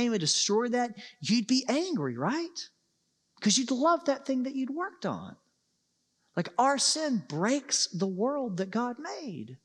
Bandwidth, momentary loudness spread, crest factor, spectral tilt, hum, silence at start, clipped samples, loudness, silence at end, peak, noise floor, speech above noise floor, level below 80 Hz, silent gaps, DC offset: 12 kHz; 13 LU; 18 dB; -3.5 dB/octave; none; 0 s; under 0.1%; -29 LUFS; 0.1 s; -12 dBFS; -76 dBFS; 47 dB; -86 dBFS; none; under 0.1%